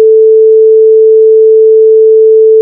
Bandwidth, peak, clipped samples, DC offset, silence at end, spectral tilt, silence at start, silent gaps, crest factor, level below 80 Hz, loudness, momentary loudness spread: 0.6 kHz; 0 dBFS; 1%; under 0.1%; 0 s; -9 dB/octave; 0 s; none; 4 dB; -70 dBFS; -4 LUFS; 0 LU